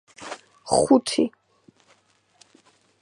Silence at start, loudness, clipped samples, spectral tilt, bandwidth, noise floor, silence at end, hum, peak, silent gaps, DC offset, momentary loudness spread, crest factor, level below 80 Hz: 0.2 s; -21 LUFS; under 0.1%; -4 dB/octave; 11.5 kHz; -62 dBFS; 1.75 s; none; -4 dBFS; none; under 0.1%; 20 LU; 22 dB; -58 dBFS